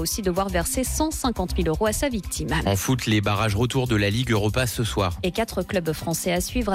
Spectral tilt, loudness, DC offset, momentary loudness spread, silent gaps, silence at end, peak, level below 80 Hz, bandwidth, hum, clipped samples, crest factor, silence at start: -4.5 dB/octave; -24 LUFS; under 0.1%; 4 LU; none; 0 s; -12 dBFS; -34 dBFS; 16 kHz; none; under 0.1%; 12 dB; 0 s